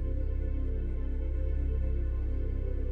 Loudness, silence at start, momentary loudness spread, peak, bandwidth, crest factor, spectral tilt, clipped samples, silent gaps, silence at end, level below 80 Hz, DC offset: -34 LUFS; 0 s; 3 LU; -20 dBFS; 3.3 kHz; 10 dB; -10.5 dB/octave; under 0.1%; none; 0 s; -30 dBFS; under 0.1%